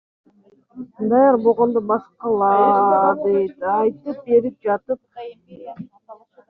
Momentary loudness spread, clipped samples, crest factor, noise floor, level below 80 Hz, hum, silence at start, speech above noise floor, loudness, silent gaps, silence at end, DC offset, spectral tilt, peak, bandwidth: 23 LU; under 0.1%; 16 dB; -55 dBFS; -64 dBFS; none; 0.75 s; 37 dB; -18 LUFS; none; 0.35 s; under 0.1%; -7 dB/octave; -4 dBFS; 4.4 kHz